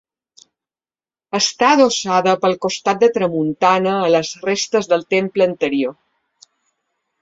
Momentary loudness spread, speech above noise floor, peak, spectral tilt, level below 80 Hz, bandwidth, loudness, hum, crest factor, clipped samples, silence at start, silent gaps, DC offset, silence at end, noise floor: 6 LU; over 74 dB; -2 dBFS; -4 dB/octave; -62 dBFS; 8 kHz; -17 LUFS; none; 16 dB; under 0.1%; 1.35 s; none; under 0.1%; 1.3 s; under -90 dBFS